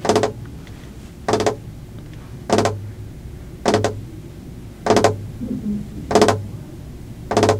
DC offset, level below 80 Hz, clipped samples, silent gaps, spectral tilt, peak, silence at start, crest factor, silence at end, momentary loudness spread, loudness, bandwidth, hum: under 0.1%; -40 dBFS; under 0.1%; none; -5 dB/octave; 0 dBFS; 0 s; 22 dB; 0 s; 20 LU; -20 LUFS; 16 kHz; none